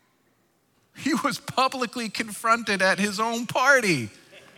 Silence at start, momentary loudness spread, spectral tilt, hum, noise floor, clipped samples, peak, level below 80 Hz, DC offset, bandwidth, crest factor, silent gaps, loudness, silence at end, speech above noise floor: 0.95 s; 10 LU; -3.5 dB/octave; none; -66 dBFS; under 0.1%; -6 dBFS; -72 dBFS; under 0.1%; 18 kHz; 20 dB; none; -23 LUFS; 0.2 s; 43 dB